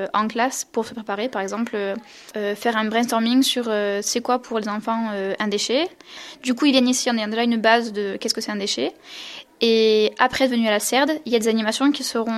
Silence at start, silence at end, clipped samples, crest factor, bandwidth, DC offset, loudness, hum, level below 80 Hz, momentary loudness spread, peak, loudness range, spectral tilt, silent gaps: 0 s; 0 s; under 0.1%; 20 dB; 14 kHz; under 0.1%; -21 LUFS; none; -64 dBFS; 11 LU; 0 dBFS; 3 LU; -3 dB/octave; none